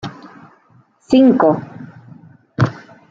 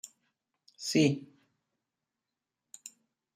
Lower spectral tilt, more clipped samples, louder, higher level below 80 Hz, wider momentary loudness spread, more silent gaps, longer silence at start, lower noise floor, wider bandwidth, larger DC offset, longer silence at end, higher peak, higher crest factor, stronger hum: first, -8 dB/octave vs -5 dB/octave; neither; first, -15 LUFS vs -30 LUFS; first, -56 dBFS vs -78 dBFS; about the same, 24 LU vs 23 LU; neither; second, 0.05 s vs 0.8 s; second, -53 dBFS vs -89 dBFS; second, 7.6 kHz vs 15.5 kHz; neither; second, 0.3 s vs 0.45 s; first, -2 dBFS vs -14 dBFS; second, 16 dB vs 22 dB; neither